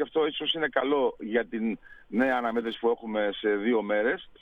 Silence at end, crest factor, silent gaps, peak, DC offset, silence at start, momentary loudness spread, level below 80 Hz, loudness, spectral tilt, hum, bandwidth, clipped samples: 0.1 s; 18 dB; none; -10 dBFS; under 0.1%; 0 s; 6 LU; -60 dBFS; -28 LUFS; -6.5 dB/octave; none; 4.9 kHz; under 0.1%